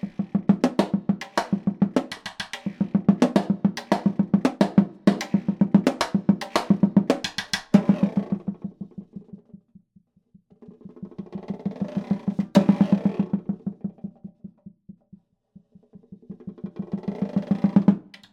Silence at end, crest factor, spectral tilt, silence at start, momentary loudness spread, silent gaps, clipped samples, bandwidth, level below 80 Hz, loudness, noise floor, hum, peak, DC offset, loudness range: 0.3 s; 22 dB; -7 dB/octave; 0.05 s; 18 LU; none; under 0.1%; 12 kHz; -60 dBFS; -23 LUFS; -61 dBFS; none; -2 dBFS; under 0.1%; 16 LU